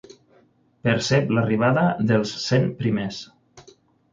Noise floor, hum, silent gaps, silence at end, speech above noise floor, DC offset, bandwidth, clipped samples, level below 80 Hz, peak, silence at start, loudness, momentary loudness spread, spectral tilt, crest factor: -59 dBFS; none; none; 0.55 s; 38 dB; under 0.1%; 7.6 kHz; under 0.1%; -56 dBFS; -6 dBFS; 0.85 s; -22 LUFS; 9 LU; -6 dB/octave; 18 dB